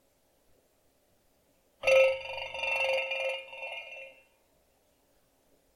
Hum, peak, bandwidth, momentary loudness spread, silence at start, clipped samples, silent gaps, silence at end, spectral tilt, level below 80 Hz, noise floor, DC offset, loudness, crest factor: none; -12 dBFS; 13.5 kHz; 19 LU; 1.85 s; under 0.1%; none; 1.65 s; -0.5 dB/octave; -68 dBFS; -69 dBFS; under 0.1%; -29 LUFS; 22 dB